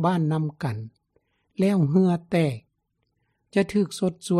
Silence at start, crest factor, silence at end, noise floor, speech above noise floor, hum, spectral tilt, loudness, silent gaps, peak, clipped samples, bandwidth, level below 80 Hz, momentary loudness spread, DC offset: 0 s; 16 dB; 0 s; -75 dBFS; 52 dB; none; -7.5 dB/octave; -24 LUFS; none; -8 dBFS; under 0.1%; 12.5 kHz; -62 dBFS; 16 LU; under 0.1%